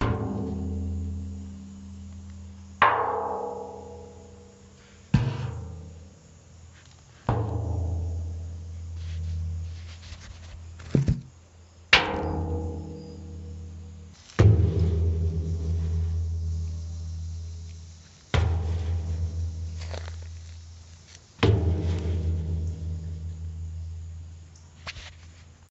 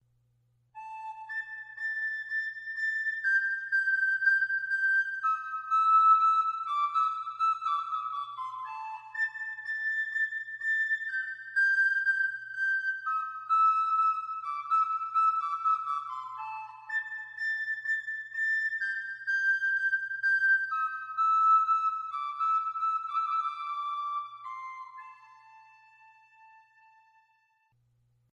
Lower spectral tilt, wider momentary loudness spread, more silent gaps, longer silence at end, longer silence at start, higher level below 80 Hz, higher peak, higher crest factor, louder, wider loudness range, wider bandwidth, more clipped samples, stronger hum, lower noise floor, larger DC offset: first, -5 dB/octave vs 2 dB/octave; first, 22 LU vs 14 LU; neither; second, 0.05 s vs 2.75 s; second, 0 s vs 0.75 s; first, -36 dBFS vs -88 dBFS; first, -2 dBFS vs -14 dBFS; first, 28 dB vs 16 dB; about the same, -28 LUFS vs -28 LUFS; about the same, 8 LU vs 7 LU; about the same, 7.8 kHz vs 8.4 kHz; neither; neither; second, -51 dBFS vs -71 dBFS; neither